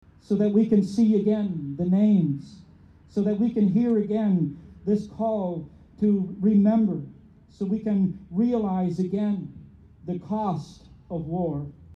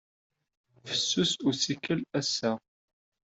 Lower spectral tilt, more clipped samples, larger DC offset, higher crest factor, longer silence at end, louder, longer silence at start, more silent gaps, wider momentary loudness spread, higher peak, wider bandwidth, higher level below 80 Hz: first, -10 dB/octave vs -3.5 dB/octave; neither; neither; about the same, 14 dB vs 18 dB; second, 0.05 s vs 0.8 s; first, -25 LUFS vs -29 LUFS; second, 0.3 s vs 0.85 s; neither; first, 14 LU vs 7 LU; first, -10 dBFS vs -14 dBFS; second, 7.2 kHz vs 8.2 kHz; first, -56 dBFS vs -70 dBFS